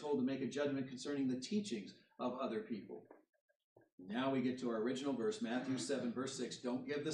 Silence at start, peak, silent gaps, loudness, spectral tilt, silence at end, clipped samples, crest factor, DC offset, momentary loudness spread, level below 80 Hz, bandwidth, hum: 0 s; -26 dBFS; 3.41-3.48 s, 3.56-3.76 s, 3.92-3.98 s; -41 LUFS; -5 dB/octave; 0 s; under 0.1%; 14 dB; under 0.1%; 9 LU; -86 dBFS; 11 kHz; none